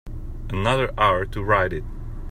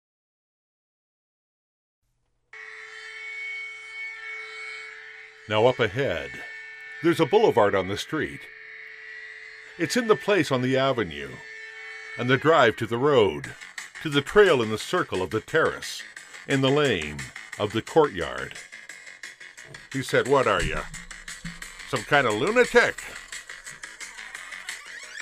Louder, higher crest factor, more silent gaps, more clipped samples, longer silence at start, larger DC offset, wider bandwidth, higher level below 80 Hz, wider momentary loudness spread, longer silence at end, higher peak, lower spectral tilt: about the same, -22 LUFS vs -24 LUFS; about the same, 18 dB vs 22 dB; neither; neither; second, 0.05 s vs 2.55 s; neither; about the same, 15 kHz vs 15.5 kHz; first, -32 dBFS vs -50 dBFS; second, 17 LU vs 20 LU; about the same, 0 s vs 0 s; about the same, -6 dBFS vs -4 dBFS; first, -6 dB/octave vs -4.5 dB/octave